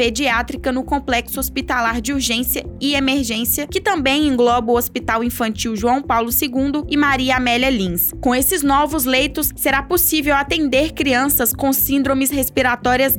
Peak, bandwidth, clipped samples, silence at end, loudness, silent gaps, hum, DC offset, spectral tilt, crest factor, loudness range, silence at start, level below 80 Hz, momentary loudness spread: -4 dBFS; over 20 kHz; under 0.1%; 0 s; -17 LUFS; none; none; under 0.1%; -3 dB/octave; 14 dB; 3 LU; 0 s; -36 dBFS; 5 LU